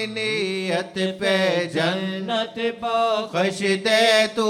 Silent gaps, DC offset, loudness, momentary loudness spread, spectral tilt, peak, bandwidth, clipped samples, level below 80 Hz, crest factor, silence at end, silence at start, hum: none; under 0.1%; -21 LUFS; 8 LU; -4 dB/octave; -6 dBFS; 16 kHz; under 0.1%; -66 dBFS; 16 dB; 0 s; 0 s; none